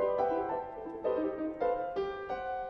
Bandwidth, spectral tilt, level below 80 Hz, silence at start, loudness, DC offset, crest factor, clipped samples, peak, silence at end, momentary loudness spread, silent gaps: 6 kHz; -7.5 dB/octave; -60 dBFS; 0 s; -34 LUFS; under 0.1%; 14 dB; under 0.1%; -18 dBFS; 0 s; 6 LU; none